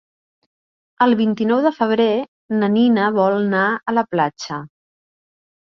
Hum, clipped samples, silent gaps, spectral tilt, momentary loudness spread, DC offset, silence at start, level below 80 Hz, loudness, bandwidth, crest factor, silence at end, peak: none; under 0.1%; 2.28-2.49 s; -6.5 dB/octave; 8 LU; under 0.1%; 1 s; -66 dBFS; -18 LUFS; 6.8 kHz; 16 dB; 1.1 s; -2 dBFS